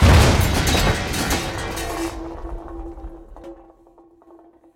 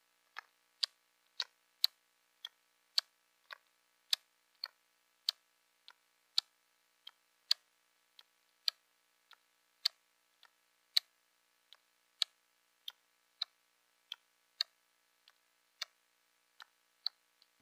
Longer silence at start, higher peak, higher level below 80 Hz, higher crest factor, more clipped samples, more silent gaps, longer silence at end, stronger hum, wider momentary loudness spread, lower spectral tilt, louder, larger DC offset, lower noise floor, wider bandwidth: second, 0 s vs 0.8 s; first, -2 dBFS vs -8 dBFS; first, -26 dBFS vs under -90 dBFS; second, 18 dB vs 38 dB; neither; neither; second, 1.2 s vs 1.75 s; second, none vs 60 Hz at -100 dBFS; first, 24 LU vs 20 LU; first, -4.5 dB/octave vs 5.5 dB/octave; first, -20 LUFS vs -39 LUFS; neither; second, -51 dBFS vs -76 dBFS; about the same, 17 kHz vs 15.5 kHz